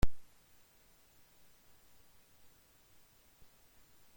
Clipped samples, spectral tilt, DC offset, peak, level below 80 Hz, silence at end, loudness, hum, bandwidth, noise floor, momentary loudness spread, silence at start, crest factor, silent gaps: under 0.1%; -5.5 dB/octave; under 0.1%; -16 dBFS; -48 dBFS; 3.95 s; -57 LUFS; none; 16.5 kHz; -65 dBFS; 1 LU; 0 s; 22 dB; none